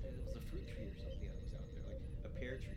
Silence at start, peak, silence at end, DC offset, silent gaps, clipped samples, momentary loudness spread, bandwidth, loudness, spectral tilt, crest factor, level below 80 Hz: 0 s; -32 dBFS; 0 s; under 0.1%; none; under 0.1%; 3 LU; 14 kHz; -49 LUFS; -7 dB/octave; 12 dB; -48 dBFS